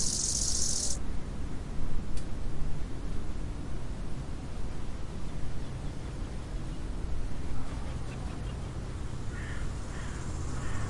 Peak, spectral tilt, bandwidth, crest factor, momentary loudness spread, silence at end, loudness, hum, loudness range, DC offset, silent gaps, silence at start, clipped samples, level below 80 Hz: -16 dBFS; -3.5 dB/octave; 11.5 kHz; 14 dB; 12 LU; 0 s; -37 LUFS; none; 6 LU; under 0.1%; none; 0 s; under 0.1%; -38 dBFS